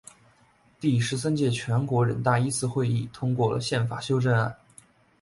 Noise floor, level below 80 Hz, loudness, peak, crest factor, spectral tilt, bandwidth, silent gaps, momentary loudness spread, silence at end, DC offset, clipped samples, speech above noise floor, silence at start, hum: -61 dBFS; -58 dBFS; -26 LUFS; -10 dBFS; 16 dB; -6 dB/octave; 11.5 kHz; none; 4 LU; 0.65 s; under 0.1%; under 0.1%; 36 dB; 0.8 s; none